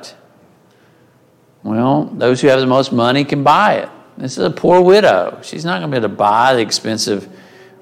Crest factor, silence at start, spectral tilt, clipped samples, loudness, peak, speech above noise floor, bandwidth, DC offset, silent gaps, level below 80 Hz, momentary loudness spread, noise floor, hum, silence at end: 14 dB; 0 s; -5 dB/octave; under 0.1%; -14 LUFS; 0 dBFS; 38 dB; 15 kHz; under 0.1%; none; -58 dBFS; 13 LU; -51 dBFS; none; 0.55 s